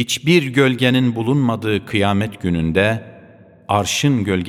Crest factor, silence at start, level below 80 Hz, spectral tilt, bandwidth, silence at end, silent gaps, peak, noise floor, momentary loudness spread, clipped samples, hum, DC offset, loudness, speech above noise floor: 16 dB; 0 s; -44 dBFS; -5 dB/octave; 16 kHz; 0 s; none; 0 dBFS; -45 dBFS; 6 LU; under 0.1%; none; under 0.1%; -17 LUFS; 28 dB